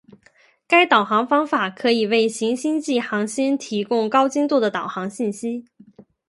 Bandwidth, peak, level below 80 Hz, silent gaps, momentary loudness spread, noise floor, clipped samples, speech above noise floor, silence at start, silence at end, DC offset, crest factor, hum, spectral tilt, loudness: 11.5 kHz; -2 dBFS; -72 dBFS; none; 10 LU; -57 dBFS; under 0.1%; 37 dB; 0.7 s; 0.7 s; under 0.1%; 20 dB; none; -4 dB/octave; -20 LUFS